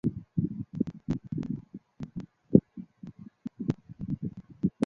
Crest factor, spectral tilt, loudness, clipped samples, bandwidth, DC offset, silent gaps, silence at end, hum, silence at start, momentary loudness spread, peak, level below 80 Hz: 28 dB; -10 dB/octave; -32 LUFS; under 0.1%; 7 kHz; under 0.1%; none; 0 s; none; 0.05 s; 21 LU; -4 dBFS; -54 dBFS